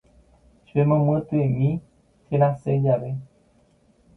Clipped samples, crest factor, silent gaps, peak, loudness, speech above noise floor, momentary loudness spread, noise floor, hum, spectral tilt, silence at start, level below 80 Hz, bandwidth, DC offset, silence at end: under 0.1%; 18 dB; none; -6 dBFS; -23 LUFS; 39 dB; 10 LU; -60 dBFS; none; -11.5 dB/octave; 0.75 s; -54 dBFS; 3.5 kHz; under 0.1%; 0.9 s